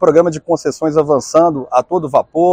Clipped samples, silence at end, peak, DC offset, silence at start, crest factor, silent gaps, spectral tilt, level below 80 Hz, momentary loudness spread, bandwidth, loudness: 0.2%; 0 s; 0 dBFS; under 0.1%; 0 s; 12 dB; none; -6.5 dB/octave; -52 dBFS; 5 LU; 9.8 kHz; -14 LUFS